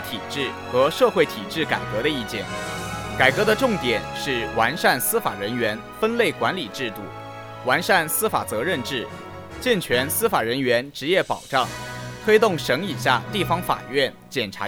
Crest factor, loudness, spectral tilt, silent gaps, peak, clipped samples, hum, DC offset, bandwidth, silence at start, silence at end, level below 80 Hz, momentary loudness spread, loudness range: 22 dB; -22 LUFS; -3.5 dB/octave; none; -2 dBFS; under 0.1%; none; under 0.1%; over 20 kHz; 0 s; 0 s; -50 dBFS; 10 LU; 2 LU